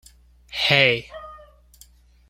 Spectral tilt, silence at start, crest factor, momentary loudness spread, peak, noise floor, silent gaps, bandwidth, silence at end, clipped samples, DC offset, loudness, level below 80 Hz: -4 dB/octave; 0.5 s; 24 dB; 23 LU; -2 dBFS; -52 dBFS; none; 16.5 kHz; 0.95 s; under 0.1%; under 0.1%; -18 LUFS; -52 dBFS